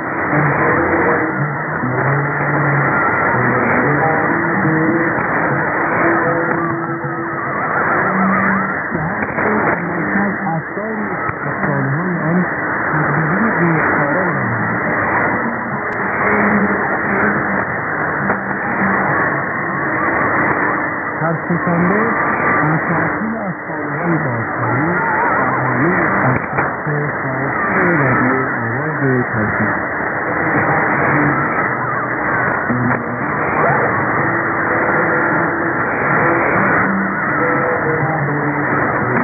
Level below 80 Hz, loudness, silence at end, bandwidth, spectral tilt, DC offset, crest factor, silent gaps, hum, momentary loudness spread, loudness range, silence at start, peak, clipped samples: -46 dBFS; -16 LUFS; 0 s; 2.7 kHz; -13.5 dB/octave; under 0.1%; 14 dB; none; none; 5 LU; 2 LU; 0 s; 0 dBFS; under 0.1%